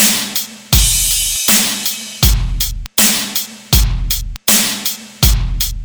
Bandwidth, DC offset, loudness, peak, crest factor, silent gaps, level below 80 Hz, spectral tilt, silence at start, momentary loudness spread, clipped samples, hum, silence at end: over 20 kHz; under 0.1%; -13 LUFS; 0 dBFS; 14 dB; none; -20 dBFS; -2 dB/octave; 0 s; 8 LU; under 0.1%; none; 0 s